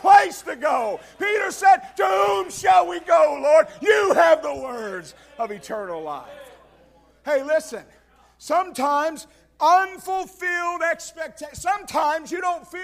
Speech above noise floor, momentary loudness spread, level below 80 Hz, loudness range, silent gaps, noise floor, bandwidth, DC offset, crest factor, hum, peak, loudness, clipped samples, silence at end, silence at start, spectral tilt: 34 dB; 16 LU; -60 dBFS; 10 LU; none; -55 dBFS; 15.5 kHz; under 0.1%; 18 dB; none; -2 dBFS; -21 LUFS; under 0.1%; 0 s; 0 s; -2.5 dB/octave